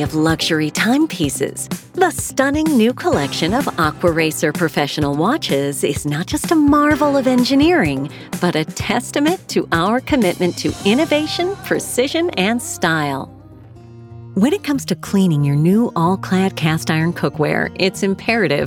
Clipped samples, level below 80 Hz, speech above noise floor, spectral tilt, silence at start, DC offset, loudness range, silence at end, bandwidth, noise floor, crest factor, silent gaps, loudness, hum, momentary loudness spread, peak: under 0.1%; -42 dBFS; 23 dB; -5 dB/octave; 0 s; under 0.1%; 4 LU; 0 s; 18 kHz; -39 dBFS; 16 dB; none; -17 LUFS; none; 6 LU; 0 dBFS